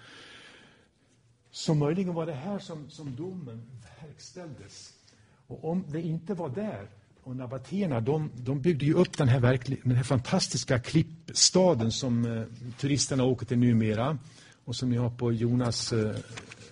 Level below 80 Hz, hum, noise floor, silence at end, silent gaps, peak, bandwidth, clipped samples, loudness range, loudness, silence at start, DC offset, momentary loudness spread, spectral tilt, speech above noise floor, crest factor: -58 dBFS; none; -65 dBFS; 0 s; none; -8 dBFS; 10.5 kHz; under 0.1%; 12 LU; -28 LUFS; 0.05 s; under 0.1%; 20 LU; -5 dB/octave; 36 dB; 20 dB